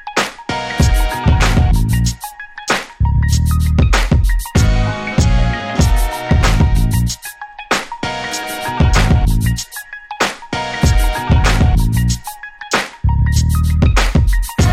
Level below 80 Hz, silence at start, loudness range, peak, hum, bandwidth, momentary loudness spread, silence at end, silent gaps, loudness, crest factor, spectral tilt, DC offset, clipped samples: -18 dBFS; 0.05 s; 2 LU; 0 dBFS; none; 15.5 kHz; 9 LU; 0 s; none; -15 LUFS; 14 dB; -5 dB/octave; under 0.1%; under 0.1%